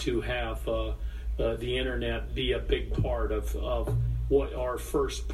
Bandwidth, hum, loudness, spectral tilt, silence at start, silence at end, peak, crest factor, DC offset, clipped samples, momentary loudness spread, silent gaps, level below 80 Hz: 13.5 kHz; none; -31 LUFS; -6 dB/octave; 0 s; 0 s; -12 dBFS; 18 dB; under 0.1%; under 0.1%; 5 LU; none; -34 dBFS